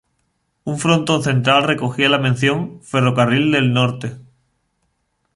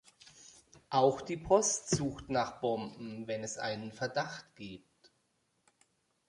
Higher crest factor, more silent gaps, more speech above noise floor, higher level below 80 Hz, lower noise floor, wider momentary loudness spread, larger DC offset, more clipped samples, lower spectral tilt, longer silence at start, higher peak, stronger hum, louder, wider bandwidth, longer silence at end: second, 16 dB vs 24 dB; neither; first, 52 dB vs 44 dB; first, -56 dBFS vs -62 dBFS; second, -68 dBFS vs -77 dBFS; second, 10 LU vs 20 LU; neither; neither; first, -5.5 dB/octave vs -4 dB/octave; first, 0.65 s vs 0.25 s; first, -2 dBFS vs -12 dBFS; neither; first, -16 LUFS vs -34 LUFS; about the same, 11.5 kHz vs 11.5 kHz; second, 1.15 s vs 1.5 s